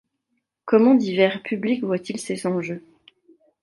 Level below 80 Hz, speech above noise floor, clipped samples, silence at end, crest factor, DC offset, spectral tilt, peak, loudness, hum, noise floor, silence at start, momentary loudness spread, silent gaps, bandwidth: -72 dBFS; 55 dB; under 0.1%; 0.85 s; 18 dB; under 0.1%; -6 dB/octave; -4 dBFS; -21 LUFS; none; -76 dBFS; 0.65 s; 15 LU; none; 11.5 kHz